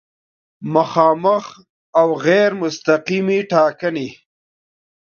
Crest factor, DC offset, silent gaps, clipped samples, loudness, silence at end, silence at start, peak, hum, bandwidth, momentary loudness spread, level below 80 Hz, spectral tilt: 18 dB; under 0.1%; 1.69-1.93 s; under 0.1%; -17 LUFS; 1 s; 0.6 s; 0 dBFS; none; 7 kHz; 10 LU; -66 dBFS; -6 dB/octave